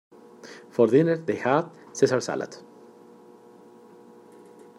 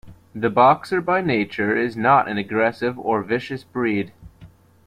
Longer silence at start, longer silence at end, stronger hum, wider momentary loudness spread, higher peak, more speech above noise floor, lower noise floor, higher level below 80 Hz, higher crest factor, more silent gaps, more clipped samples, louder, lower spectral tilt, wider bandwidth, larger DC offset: first, 0.45 s vs 0.05 s; first, 2.2 s vs 0.4 s; neither; first, 25 LU vs 10 LU; about the same, -6 dBFS vs -4 dBFS; about the same, 27 dB vs 28 dB; about the same, -50 dBFS vs -48 dBFS; second, -76 dBFS vs -56 dBFS; about the same, 20 dB vs 18 dB; neither; neither; second, -24 LUFS vs -20 LUFS; about the same, -6 dB/octave vs -7 dB/octave; second, 12 kHz vs 14 kHz; neither